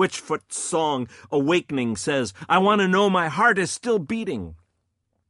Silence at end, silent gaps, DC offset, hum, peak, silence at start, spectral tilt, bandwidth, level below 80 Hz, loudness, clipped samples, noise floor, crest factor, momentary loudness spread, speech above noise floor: 0.75 s; none; under 0.1%; none; -6 dBFS; 0 s; -4.5 dB/octave; 11.5 kHz; -58 dBFS; -22 LUFS; under 0.1%; -74 dBFS; 18 dB; 10 LU; 52 dB